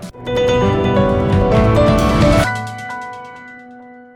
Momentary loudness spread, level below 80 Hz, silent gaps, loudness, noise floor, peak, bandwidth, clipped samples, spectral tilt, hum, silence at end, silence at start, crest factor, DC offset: 19 LU; -26 dBFS; none; -14 LUFS; -38 dBFS; -2 dBFS; 18 kHz; under 0.1%; -6.5 dB/octave; none; 0.15 s; 0 s; 12 dB; under 0.1%